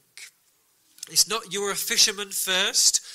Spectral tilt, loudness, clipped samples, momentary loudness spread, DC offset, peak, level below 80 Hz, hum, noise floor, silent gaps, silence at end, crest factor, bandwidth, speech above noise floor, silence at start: 1 dB/octave; -21 LUFS; under 0.1%; 9 LU; under 0.1%; -2 dBFS; -66 dBFS; none; -65 dBFS; none; 0 s; 22 dB; 16 kHz; 41 dB; 0.15 s